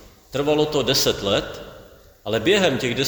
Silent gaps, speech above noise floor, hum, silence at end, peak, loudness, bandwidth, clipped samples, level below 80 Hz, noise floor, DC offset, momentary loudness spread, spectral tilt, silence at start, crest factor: none; 26 dB; none; 0 s; -4 dBFS; -20 LUFS; over 20 kHz; under 0.1%; -46 dBFS; -46 dBFS; under 0.1%; 18 LU; -3.5 dB/octave; 0.3 s; 18 dB